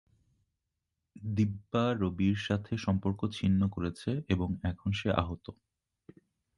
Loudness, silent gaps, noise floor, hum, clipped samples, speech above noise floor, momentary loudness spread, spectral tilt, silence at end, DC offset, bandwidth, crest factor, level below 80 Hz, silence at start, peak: -32 LUFS; none; -85 dBFS; none; under 0.1%; 54 dB; 7 LU; -7.5 dB/octave; 1.05 s; under 0.1%; 11.5 kHz; 22 dB; -48 dBFS; 1.15 s; -10 dBFS